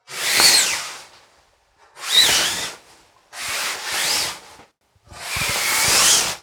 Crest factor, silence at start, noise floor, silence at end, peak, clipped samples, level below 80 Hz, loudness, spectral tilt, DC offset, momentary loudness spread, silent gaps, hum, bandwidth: 22 dB; 0.1 s; -58 dBFS; 0.05 s; 0 dBFS; under 0.1%; -52 dBFS; -16 LUFS; 1 dB/octave; under 0.1%; 19 LU; none; none; over 20 kHz